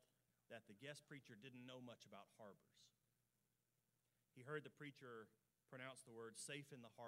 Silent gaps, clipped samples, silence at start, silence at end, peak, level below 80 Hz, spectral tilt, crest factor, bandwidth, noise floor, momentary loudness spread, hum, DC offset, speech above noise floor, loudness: none; under 0.1%; 0 s; 0 s; -38 dBFS; under -90 dBFS; -4 dB/octave; 22 dB; 15.5 kHz; -89 dBFS; 10 LU; none; under 0.1%; 30 dB; -59 LUFS